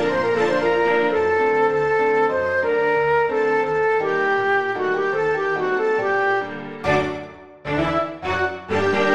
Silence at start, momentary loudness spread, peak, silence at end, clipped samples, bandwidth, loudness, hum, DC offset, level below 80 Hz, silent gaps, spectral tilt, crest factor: 0 s; 6 LU; -6 dBFS; 0 s; under 0.1%; 8.4 kHz; -20 LUFS; none; 0.3%; -52 dBFS; none; -6 dB/octave; 14 dB